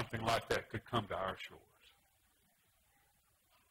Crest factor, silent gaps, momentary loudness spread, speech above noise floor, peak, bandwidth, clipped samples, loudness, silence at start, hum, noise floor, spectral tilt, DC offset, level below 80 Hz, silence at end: 22 dB; none; 10 LU; 35 dB; -20 dBFS; 16 kHz; under 0.1%; -39 LUFS; 0 s; none; -75 dBFS; -4.5 dB/octave; under 0.1%; -64 dBFS; 2.1 s